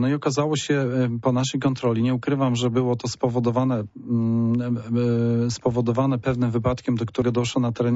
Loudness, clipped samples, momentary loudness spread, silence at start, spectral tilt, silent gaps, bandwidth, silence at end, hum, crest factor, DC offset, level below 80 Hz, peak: -23 LUFS; under 0.1%; 3 LU; 0 s; -6.5 dB/octave; none; 8 kHz; 0 s; none; 12 dB; under 0.1%; -50 dBFS; -10 dBFS